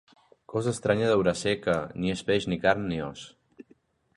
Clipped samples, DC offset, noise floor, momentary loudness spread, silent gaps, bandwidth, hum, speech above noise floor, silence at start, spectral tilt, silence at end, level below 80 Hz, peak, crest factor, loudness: under 0.1%; under 0.1%; -63 dBFS; 10 LU; none; 11.5 kHz; none; 37 dB; 0.5 s; -5.5 dB/octave; 0.55 s; -54 dBFS; -8 dBFS; 20 dB; -27 LUFS